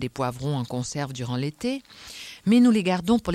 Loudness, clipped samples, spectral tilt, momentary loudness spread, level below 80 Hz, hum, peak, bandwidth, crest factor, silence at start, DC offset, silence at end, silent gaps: -24 LUFS; under 0.1%; -6 dB/octave; 16 LU; -54 dBFS; none; -8 dBFS; 13.5 kHz; 16 dB; 0 s; under 0.1%; 0 s; none